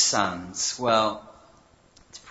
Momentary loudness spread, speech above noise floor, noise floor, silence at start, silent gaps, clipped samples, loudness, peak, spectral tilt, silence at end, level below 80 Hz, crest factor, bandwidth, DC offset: 16 LU; 31 dB; -57 dBFS; 0 s; none; under 0.1%; -24 LUFS; -6 dBFS; -2 dB/octave; 0 s; -60 dBFS; 20 dB; 8.2 kHz; under 0.1%